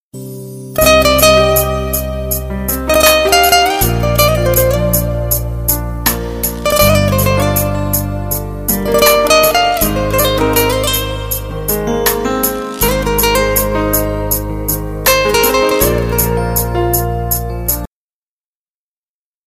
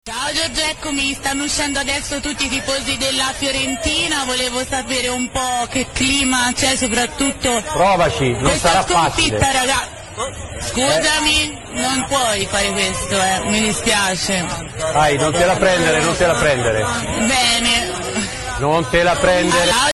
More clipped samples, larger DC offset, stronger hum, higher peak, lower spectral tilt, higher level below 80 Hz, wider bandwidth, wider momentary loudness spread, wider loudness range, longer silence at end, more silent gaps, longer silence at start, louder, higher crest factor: neither; neither; neither; about the same, 0 dBFS vs 0 dBFS; about the same, -3.5 dB/octave vs -2.5 dB/octave; first, -24 dBFS vs -34 dBFS; first, 16 kHz vs 12.5 kHz; first, 10 LU vs 7 LU; about the same, 3 LU vs 3 LU; first, 1.6 s vs 0 s; neither; about the same, 0.15 s vs 0.05 s; first, -12 LUFS vs -16 LUFS; about the same, 14 dB vs 18 dB